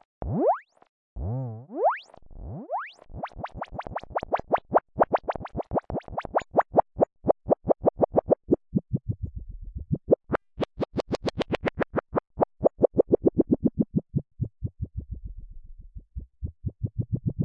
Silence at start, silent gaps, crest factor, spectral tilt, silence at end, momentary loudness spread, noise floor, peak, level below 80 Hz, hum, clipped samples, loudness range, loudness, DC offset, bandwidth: 0.2 s; 0.89-1.16 s; 22 dB; -8.5 dB/octave; 0 s; 16 LU; -44 dBFS; -6 dBFS; -44 dBFS; none; under 0.1%; 7 LU; -28 LUFS; under 0.1%; 8.4 kHz